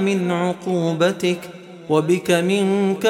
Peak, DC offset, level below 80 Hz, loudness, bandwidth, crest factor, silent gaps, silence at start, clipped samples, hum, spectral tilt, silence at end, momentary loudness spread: -4 dBFS; under 0.1%; -66 dBFS; -20 LUFS; 16 kHz; 16 dB; none; 0 s; under 0.1%; none; -5.5 dB/octave; 0 s; 7 LU